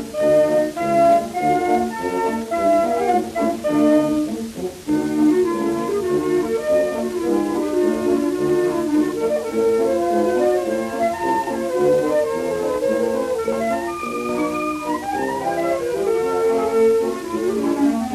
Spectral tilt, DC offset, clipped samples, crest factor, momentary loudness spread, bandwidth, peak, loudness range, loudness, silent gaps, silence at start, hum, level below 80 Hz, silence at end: -5.5 dB/octave; under 0.1%; under 0.1%; 14 dB; 6 LU; 14.5 kHz; -6 dBFS; 3 LU; -20 LUFS; none; 0 s; none; -52 dBFS; 0 s